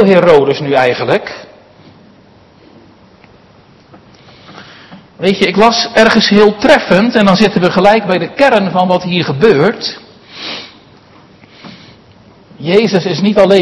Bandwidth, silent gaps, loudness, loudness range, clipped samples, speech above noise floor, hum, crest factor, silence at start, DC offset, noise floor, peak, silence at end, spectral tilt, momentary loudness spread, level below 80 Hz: 12 kHz; none; -10 LUFS; 11 LU; 1%; 34 dB; none; 12 dB; 0 s; under 0.1%; -43 dBFS; 0 dBFS; 0 s; -5.5 dB/octave; 15 LU; -46 dBFS